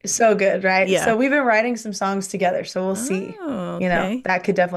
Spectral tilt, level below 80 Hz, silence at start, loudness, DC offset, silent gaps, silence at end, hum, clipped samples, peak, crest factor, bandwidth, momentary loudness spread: -4 dB/octave; -52 dBFS; 0.05 s; -20 LUFS; under 0.1%; none; 0 s; none; under 0.1%; -6 dBFS; 14 dB; 12.5 kHz; 8 LU